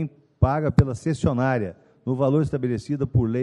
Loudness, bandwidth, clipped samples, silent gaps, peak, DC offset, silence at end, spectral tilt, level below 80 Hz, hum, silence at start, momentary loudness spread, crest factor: -23 LUFS; 10.5 kHz; under 0.1%; none; -4 dBFS; under 0.1%; 0 s; -8.5 dB/octave; -40 dBFS; none; 0 s; 9 LU; 18 dB